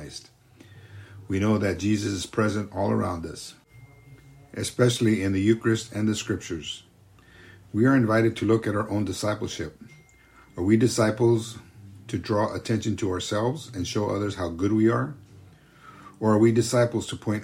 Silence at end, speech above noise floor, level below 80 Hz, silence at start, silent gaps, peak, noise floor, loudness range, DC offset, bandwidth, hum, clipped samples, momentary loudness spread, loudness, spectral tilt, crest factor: 0 s; 30 dB; -56 dBFS; 0 s; none; -8 dBFS; -54 dBFS; 3 LU; under 0.1%; 16 kHz; none; under 0.1%; 16 LU; -25 LUFS; -6 dB/octave; 18 dB